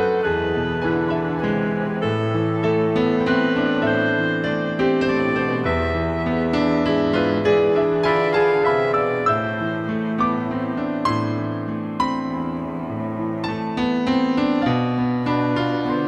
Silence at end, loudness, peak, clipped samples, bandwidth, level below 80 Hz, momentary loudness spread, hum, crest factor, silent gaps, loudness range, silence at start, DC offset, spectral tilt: 0 s; -21 LUFS; -6 dBFS; under 0.1%; 8.8 kHz; -44 dBFS; 7 LU; none; 14 dB; none; 5 LU; 0 s; under 0.1%; -7.5 dB/octave